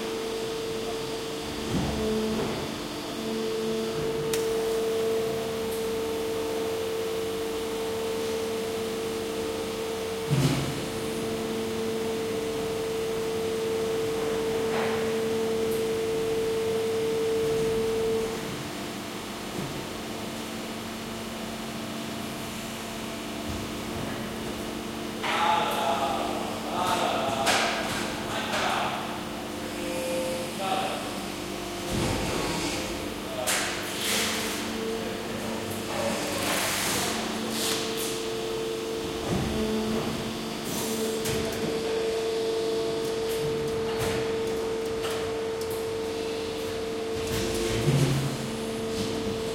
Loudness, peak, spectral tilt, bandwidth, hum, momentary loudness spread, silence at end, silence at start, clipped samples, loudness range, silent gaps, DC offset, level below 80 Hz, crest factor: -29 LUFS; -10 dBFS; -4 dB/octave; 16.5 kHz; none; 8 LU; 0 s; 0 s; under 0.1%; 4 LU; none; under 0.1%; -50 dBFS; 20 dB